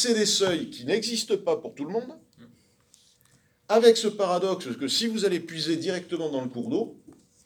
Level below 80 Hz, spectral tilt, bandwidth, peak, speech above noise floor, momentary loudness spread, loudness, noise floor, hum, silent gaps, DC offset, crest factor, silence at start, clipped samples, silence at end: -72 dBFS; -3.5 dB/octave; 19 kHz; -4 dBFS; 38 dB; 12 LU; -26 LUFS; -63 dBFS; none; none; under 0.1%; 22 dB; 0 s; under 0.1%; 0.35 s